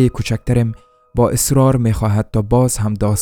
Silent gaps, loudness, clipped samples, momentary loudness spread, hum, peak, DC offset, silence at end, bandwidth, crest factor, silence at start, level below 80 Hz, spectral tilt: none; -16 LUFS; under 0.1%; 8 LU; none; 0 dBFS; under 0.1%; 0 s; 19.5 kHz; 14 dB; 0 s; -32 dBFS; -6 dB/octave